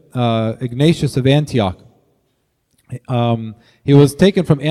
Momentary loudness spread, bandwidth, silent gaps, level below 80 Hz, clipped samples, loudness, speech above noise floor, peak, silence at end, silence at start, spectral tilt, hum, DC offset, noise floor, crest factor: 13 LU; 13 kHz; none; -46 dBFS; under 0.1%; -15 LUFS; 51 dB; 0 dBFS; 0 s; 0.15 s; -7 dB/octave; none; under 0.1%; -65 dBFS; 16 dB